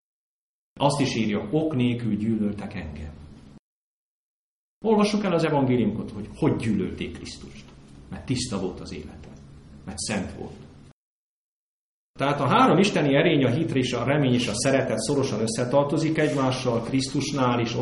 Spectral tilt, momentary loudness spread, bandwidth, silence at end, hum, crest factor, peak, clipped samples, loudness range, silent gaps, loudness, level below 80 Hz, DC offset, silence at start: -5.5 dB/octave; 18 LU; 11.5 kHz; 0 s; none; 20 dB; -6 dBFS; under 0.1%; 11 LU; 3.59-4.81 s, 10.92-12.14 s; -24 LUFS; -50 dBFS; under 0.1%; 0.75 s